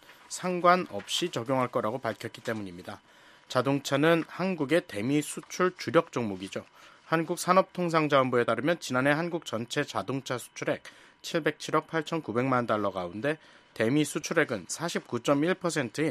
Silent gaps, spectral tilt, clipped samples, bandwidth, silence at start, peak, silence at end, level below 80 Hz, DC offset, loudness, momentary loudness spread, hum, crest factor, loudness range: none; -5 dB/octave; under 0.1%; 14.5 kHz; 0.1 s; -6 dBFS; 0 s; -72 dBFS; under 0.1%; -29 LUFS; 11 LU; none; 22 dB; 4 LU